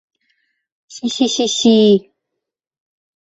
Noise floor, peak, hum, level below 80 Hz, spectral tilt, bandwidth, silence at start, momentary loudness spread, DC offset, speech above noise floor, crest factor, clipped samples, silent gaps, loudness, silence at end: -79 dBFS; -2 dBFS; none; -60 dBFS; -4.5 dB/octave; 8 kHz; 0.9 s; 11 LU; under 0.1%; 65 dB; 16 dB; under 0.1%; none; -14 LUFS; 1.25 s